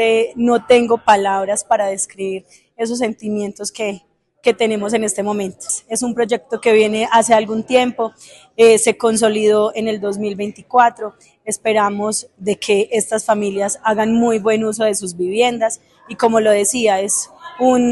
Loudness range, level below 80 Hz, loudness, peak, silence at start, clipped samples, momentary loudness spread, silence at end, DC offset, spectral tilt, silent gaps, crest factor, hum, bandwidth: 6 LU; -58 dBFS; -16 LUFS; 0 dBFS; 0 s; under 0.1%; 11 LU; 0 s; under 0.1%; -3.5 dB/octave; none; 16 dB; none; 12.5 kHz